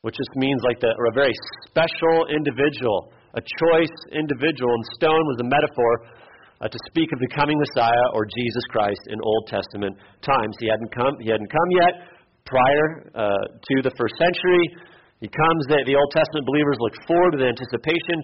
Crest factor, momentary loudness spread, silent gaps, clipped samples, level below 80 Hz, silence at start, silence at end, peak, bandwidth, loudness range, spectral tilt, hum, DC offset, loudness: 14 dB; 9 LU; none; under 0.1%; -54 dBFS; 0.05 s; 0 s; -8 dBFS; 5.8 kHz; 2 LU; -4 dB/octave; none; under 0.1%; -21 LUFS